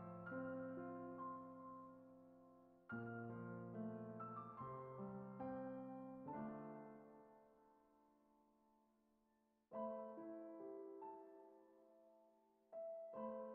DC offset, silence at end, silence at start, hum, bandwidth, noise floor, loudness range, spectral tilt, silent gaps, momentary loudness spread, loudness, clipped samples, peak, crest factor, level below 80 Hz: under 0.1%; 0 s; 0 s; none; 3.3 kHz; -83 dBFS; 6 LU; -5 dB/octave; none; 15 LU; -53 LUFS; under 0.1%; -38 dBFS; 16 dB; -86 dBFS